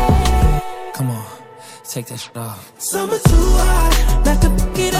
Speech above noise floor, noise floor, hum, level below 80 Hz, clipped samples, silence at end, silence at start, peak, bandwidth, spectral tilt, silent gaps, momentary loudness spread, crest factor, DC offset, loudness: 24 dB; -38 dBFS; none; -18 dBFS; under 0.1%; 0 s; 0 s; 0 dBFS; 16 kHz; -5 dB/octave; none; 15 LU; 16 dB; under 0.1%; -17 LUFS